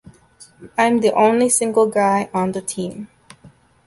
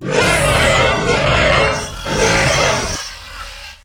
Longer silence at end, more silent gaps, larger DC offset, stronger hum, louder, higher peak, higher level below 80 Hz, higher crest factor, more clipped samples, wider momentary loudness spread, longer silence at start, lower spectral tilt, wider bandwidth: first, 0.4 s vs 0.1 s; neither; neither; neither; second, -17 LUFS vs -14 LUFS; about the same, -2 dBFS vs 0 dBFS; second, -60 dBFS vs -28 dBFS; about the same, 16 dB vs 14 dB; neither; second, 13 LU vs 17 LU; first, 0.6 s vs 0 s; about the same, -4 dB/octave vs -3.5 dB/octave; second, 12 kHz vs over 20 kHz